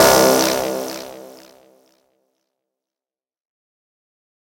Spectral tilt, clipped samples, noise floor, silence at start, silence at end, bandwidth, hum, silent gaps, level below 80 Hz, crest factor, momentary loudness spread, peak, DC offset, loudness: -2.5 dB/octave; under 0.1%; under -90 dBFS; 0 s; 3.2 s; 17.5 kHz; none; none; -50 dBFS; 20 dB; 23 LU; 0 dBFS; under 0.1%; -16 LUFS